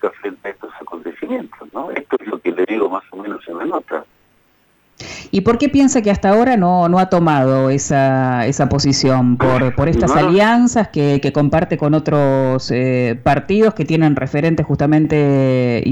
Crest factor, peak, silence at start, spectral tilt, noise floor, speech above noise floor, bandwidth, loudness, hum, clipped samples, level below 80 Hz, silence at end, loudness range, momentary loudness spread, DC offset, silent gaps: 12 dB; -4 dBFS; 0.05 s; -6.5 dB/octave; -57 dBFS; 42 dB; 18 kHz; -15 LUFS; none; under 0.1%; -38 dBFS; 0 s; 9 LU; 15 LU; under 0.1%; none